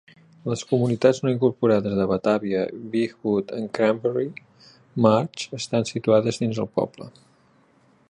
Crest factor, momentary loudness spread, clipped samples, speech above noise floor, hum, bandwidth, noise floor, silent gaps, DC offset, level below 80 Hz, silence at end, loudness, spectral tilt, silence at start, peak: 20 dB; 11 LU; under 0.1%; 37 dB; none; 11 kHz; -59 dBFS; none; under 0.1%; -60 dBFS; 1 s; -23 LUFS; -6.5 dB/octave; 0.45 s; -4 dBFS